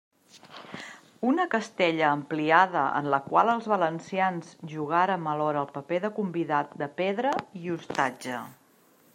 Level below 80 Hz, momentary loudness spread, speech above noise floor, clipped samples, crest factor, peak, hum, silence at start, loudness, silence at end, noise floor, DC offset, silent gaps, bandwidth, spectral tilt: -76 dBFS; 16 LU; 34 dB; under 0.1%; 22 dB; -6 dBFS; none; 0.35 s; -27 LUFS; 0.6 s; -61 dBFS; under 0.1%; none; 16 kHz; -5.5 dB/octave